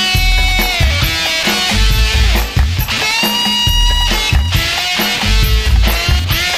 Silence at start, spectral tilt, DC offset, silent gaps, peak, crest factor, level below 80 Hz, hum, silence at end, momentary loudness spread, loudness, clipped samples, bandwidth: 0 s; -3 dB/octave; under 0.1%; none; -2 dBFS; 12 dB; -16 dBFS; none; 0 s; 2 LU; -12 LUFS; under 0.1%; 15.5 kHz